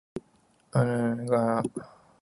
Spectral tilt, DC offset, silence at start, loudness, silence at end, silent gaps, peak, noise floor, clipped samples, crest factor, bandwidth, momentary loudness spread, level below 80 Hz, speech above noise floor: -8 dB/octave; under 0.1%; 0.15 s; -27 LUFS; 0.35 s; none; -10 dBFS; -64 dBFS; under 0.1%; 18 dB; 11.5 kHz; 17 LU; -64 dBFS; 38 dB